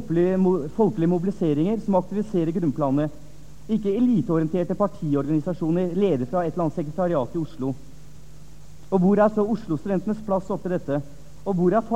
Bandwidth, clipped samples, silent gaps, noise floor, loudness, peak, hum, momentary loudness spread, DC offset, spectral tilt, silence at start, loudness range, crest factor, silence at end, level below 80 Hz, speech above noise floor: 9.4 kHz; under 0.1%; none; -46 dBFS; -24 LUFS; -6 dBFS; none; 8 LU; 1%; -9 dB/octave; 0 s; 2 LU; 16 dB; 0 s; -50 dBFS; 24 dB